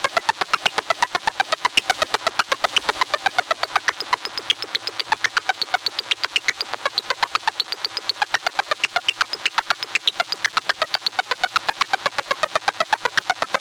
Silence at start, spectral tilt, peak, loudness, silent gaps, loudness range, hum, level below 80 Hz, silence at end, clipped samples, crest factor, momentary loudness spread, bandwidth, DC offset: 0 s; 0 dB/octave; -4 dBFS; -21 LUFS; none; 2 LU; none; -60 dBFS; 0 s; under 0.1%; 20 dB; 4 LU; 19 kHz; under 0.1%